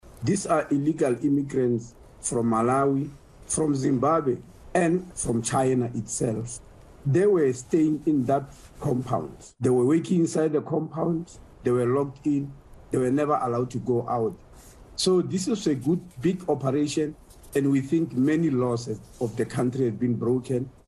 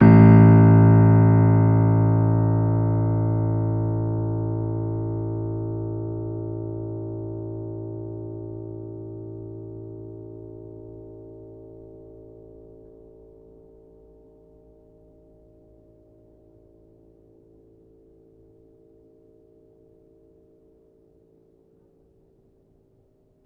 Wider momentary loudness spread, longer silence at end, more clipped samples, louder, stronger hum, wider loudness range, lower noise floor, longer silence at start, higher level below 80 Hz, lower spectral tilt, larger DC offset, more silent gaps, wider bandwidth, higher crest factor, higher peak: second, 8 LU vs 27 LU; second, 0.2 s vs 11.9 s; neither; second, -25 LUFS vs -19 LUFS; neither; second, 2 LU vs 26 LU; second, -48 dBFS vs -61 dBFS; about the same, 0.05 s vs 0 s; second, -54 dBFS vs -46 dBFS; second, -6 dB/octave vs -13.5 dB/octave; neither; neither; first, 12.5 kHz vs 2.9 kHz; second, 14 dB vs 22 dB; second, -10 dBFS vs -2 dBFS